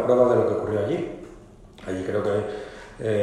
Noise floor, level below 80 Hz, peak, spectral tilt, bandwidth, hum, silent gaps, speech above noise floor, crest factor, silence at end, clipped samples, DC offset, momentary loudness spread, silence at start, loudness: -46 dBFS; -52 dBFS; -6 dBFS; -7.5 dB/octave; 11.5 kHz; none; none; 23 dB; 18 dB; 0 s; under 0.1%; under 0.1%; 21 LU; 0 s; -24 LUFS